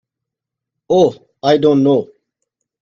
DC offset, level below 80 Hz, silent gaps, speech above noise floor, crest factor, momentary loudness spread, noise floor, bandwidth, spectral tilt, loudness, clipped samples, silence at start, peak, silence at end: under 0.1%; -58 dBFS; none; 70 dB; 16 dB; 8 LU; -83 dBFS; 7.4 kHz; -7 dB/octave; -14 LUFS; under 0.1%; 0.9 s; 0 dBFS; 0.8 s